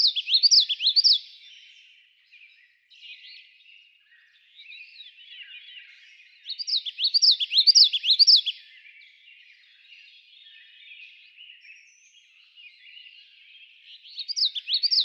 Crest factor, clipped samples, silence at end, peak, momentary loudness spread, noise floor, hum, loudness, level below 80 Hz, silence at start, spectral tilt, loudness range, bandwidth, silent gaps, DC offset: 22 dB; under 0.1%; 0 s; -6 dBFS; 28 LU; -59 dBFS; none; -18 LUFS; under -90 dBFS; 0 s; 11 dB/octave; 16 LU; 16 kHz; none; under 0.1%